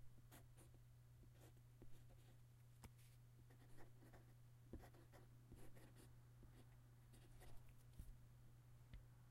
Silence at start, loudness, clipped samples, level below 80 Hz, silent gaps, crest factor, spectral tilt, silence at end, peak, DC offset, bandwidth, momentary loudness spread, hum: 0 s; -67 LUFS; under 0.1%; -70 dBFS; none; 20 dB; -5.5 dB/octave; 0 s; -44 dBFS; under 0.1%; 16 kHz; 4 LU; none